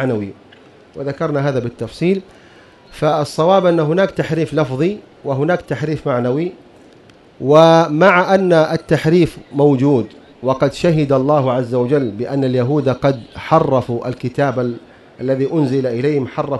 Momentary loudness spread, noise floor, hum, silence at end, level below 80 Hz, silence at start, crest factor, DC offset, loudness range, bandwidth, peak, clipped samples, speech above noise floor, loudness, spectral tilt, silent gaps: 11 LU; -45 dBFS; none; 0 s; -48 dBFS; 0 s; 16 dB; under 0.1%; 6 LU; 12 kHz; 0 dBFS; under 0.1%; 30 dB; -16 LUFS; -7.5 dB/octave; none